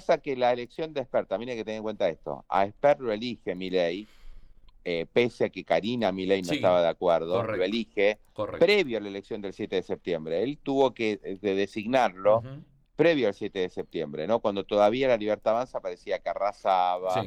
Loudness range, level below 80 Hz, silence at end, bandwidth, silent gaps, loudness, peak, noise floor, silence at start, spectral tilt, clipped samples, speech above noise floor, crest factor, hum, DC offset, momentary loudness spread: 3 LU; -58 dBFS; 0 s; 10.5 kHz; none; -27 LUFS; -10 dBFS; -49 dBFS; 0 s; -6 dB/octave; under 0.1%; 22 dB; 16 dB; none; under 0.1%; 10 LU